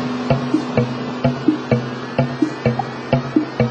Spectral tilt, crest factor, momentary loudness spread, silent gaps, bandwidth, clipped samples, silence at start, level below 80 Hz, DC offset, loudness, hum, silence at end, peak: -7.5 dB/octave; 16 dB; 3 LU; none; 8.4 kHz; under 0.1%; 0 s; -46 dBFS; under 0.1%; -20 LUFS; none; 0 s; -2 dBFS